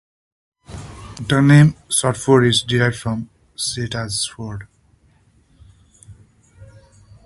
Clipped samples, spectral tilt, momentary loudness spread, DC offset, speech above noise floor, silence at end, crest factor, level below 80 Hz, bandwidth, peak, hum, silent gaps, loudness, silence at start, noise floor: under 0.1%; -5 dB/octave; 23 LU; under 0.1%; 39 dB; 0.6 s; 18 dB; -46 dBFS; 12 kHz; -2 dBFS; none; none; -17 LUFS; 0.7 s; -56 dBFS